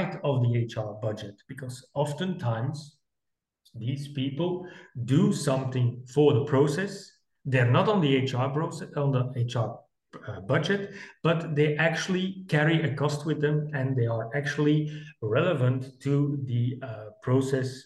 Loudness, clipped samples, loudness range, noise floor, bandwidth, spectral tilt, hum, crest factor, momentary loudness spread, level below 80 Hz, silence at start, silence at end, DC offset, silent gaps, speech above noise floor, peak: -27 LUFS; under 0.1%; 7 LU; -85 dBFS; 12 kHz; -7 dB/octave; none; 18 dB; 14 LU; -68 dBFS; 0 s; 0.05 s; under 0.1%; none; 58 dB; -10 dBFS